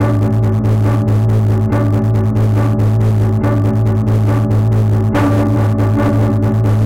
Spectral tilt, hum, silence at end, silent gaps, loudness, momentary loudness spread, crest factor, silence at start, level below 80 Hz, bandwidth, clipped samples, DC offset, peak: -9 dB/octave; none; 0 s; none; -13 LUFS; 1 LU; 6 dB; 0 s; -30 dBFS; 7 kHz; under 0.1%; 0.8%; -6 dBFS